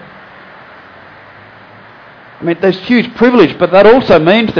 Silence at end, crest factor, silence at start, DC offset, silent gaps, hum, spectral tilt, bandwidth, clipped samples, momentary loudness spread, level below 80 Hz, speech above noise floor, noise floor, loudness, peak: 0 s; 12 dB; 2.4 s; under 0.1%; none; none; -7.5 dB/octave; 5.4 kHz; 0.4%; 8 LU; -42 dBFS; 29 dB; -37 dBFS; -9 LUFS; 0 dBFS